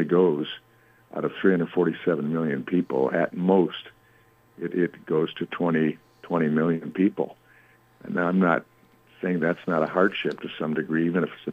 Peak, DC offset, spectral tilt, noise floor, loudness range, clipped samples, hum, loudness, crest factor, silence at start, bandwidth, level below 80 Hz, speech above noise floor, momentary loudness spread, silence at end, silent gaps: -6 dBFS; under 0.1%; -8.5 dB/octave; -59 dBFS; 2 LU; under 0.1%; none; -25 LUFS; 18 dB; 0 s; 5.2 kHz; -72 dBFS; 34 dB; 10 LU; 0 s; none